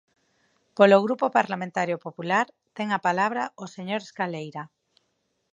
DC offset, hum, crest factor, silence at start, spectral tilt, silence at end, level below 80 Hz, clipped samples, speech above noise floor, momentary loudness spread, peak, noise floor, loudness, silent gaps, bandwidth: under 0.1%; none; 24 dB; 0.75 s; -5.5 dB/octave; 0.85 s; -80 dBFS; under 0.1%; 50 dB; 19 LU; -2 dBFS; -74 dBFS; -24 LUFS; none; 7.8 kHz